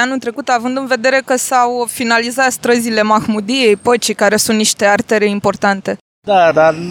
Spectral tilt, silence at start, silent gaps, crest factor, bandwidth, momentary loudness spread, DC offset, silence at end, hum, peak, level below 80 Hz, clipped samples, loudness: -3 dB/octave; 0 s; 6.01-6.22 s; 12 dB; 19 kHz; 5 LU; under 0.1%; 0 s; none; 0 dBFS; -54 dBFS; under 0.1%; -13 LUFS